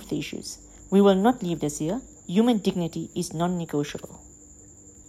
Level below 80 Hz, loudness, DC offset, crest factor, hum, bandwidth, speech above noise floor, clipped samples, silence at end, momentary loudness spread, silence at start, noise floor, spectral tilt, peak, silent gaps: -54 dBFS; -25 LUFS; under 0.1%; 18 dB; none; 14.5 kHz; 25 dB; under 0.1%; 0.05 s; 17 LU; 0 s; -49 dBFS; -6 dB/octave; -8 dBFS; none